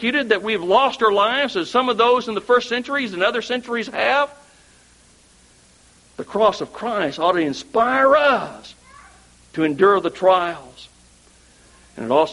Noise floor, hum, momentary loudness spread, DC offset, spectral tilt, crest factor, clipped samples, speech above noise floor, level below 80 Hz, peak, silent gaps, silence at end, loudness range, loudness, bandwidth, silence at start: -52 dBFS; none; 11 LU; under 0.1%; -4.5 dB/octave; 18 dB; under 0.1%; 34 dB; -58 dBFS; -2 dBFS; none; 0 s; 6 LU; -19 LUFS; 11.5 kHz; 0 s